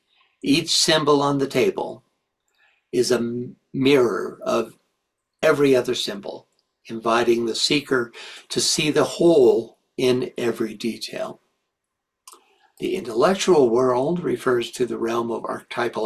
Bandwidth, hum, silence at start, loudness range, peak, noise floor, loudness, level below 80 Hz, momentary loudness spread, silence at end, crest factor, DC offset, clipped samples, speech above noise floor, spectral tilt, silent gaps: 14 kHz; none; 0.45 s; 4 LU; -4 dBFS; -81 dBFS; -21 LUFS; -60 dBFS; 14 LU; 0 s; 18 dB; under 0.1%; under 0.1%; 60 dB; -4 dB/octave; none